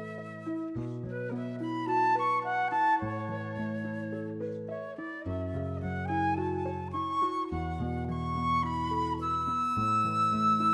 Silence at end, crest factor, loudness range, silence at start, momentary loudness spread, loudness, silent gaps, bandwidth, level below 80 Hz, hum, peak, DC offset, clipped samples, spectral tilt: 0 s; 14 dB; 4 LU; 0 s; 10 LU; -31 LUFS; none; 11 kHz; -52 dBFS; none; -18 dBFS; under 0.1%; under 0.1%; -7 dB/octave